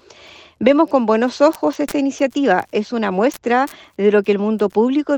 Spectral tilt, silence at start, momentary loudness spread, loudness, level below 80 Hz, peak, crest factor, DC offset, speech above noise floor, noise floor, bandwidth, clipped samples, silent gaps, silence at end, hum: -6 dB/octave; 0.6 s; 5 LU; -17 LUFS; -58 dBFS; 0 dBFS; 16 dB; under 0.1%; 27 dB; -43 dBFS; 19 kHz; under 0.1%; none; 0 s; none